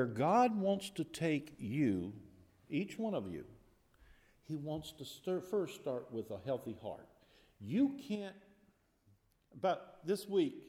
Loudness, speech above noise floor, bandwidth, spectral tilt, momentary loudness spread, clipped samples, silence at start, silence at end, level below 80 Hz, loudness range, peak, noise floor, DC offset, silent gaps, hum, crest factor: -38 LUFS; 35 dB; 16 kHz; -6.5 dB/octave; 15 LU; under 0.1%; 0 s; 0 s; -72 dBFS; 6 LU; -20 dBFS; -72 dBFS; under 0.1%; none; none; 18 dB